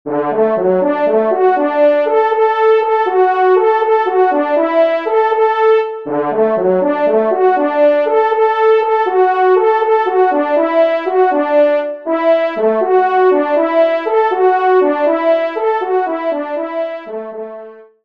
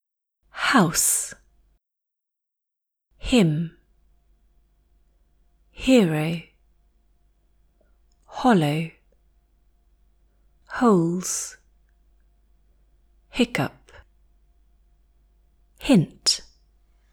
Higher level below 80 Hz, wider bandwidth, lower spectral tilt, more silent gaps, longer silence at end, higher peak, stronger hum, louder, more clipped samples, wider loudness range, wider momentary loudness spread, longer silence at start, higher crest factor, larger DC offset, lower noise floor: second, -68 dBFS vs -50 dBFS; second, 5.6 kHz vs 19 kHz; first, -7.5 dB/octave vs -4 dB/octave; neither; second, 0.2 s vs 0.7 s; first, -2 dBFS vs -6 dBFS; neither; first, -13 LUFS vs -22 LUFS; neither; second, 2 LU vs 7 LU; second, 7 LU vs 16 LU; second, 0.05 s vs 0.55 s; second, 12 dB vs 22 dB; first, 0.3% vs under 0.1%; second, -34 dBFS vs -84 dBFS